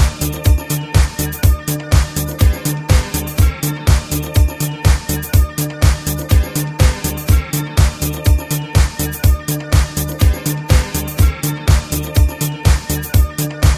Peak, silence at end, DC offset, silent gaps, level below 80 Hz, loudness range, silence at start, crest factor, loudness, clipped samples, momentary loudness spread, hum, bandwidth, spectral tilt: 0 dBFS; 0 s; under 0.1%; none; -16 dBFS; 0 LU; 0 s; 14 dB; -16 LUFS; under 0.1%; 3 LU; none; 16 kHz; -5 dB/octave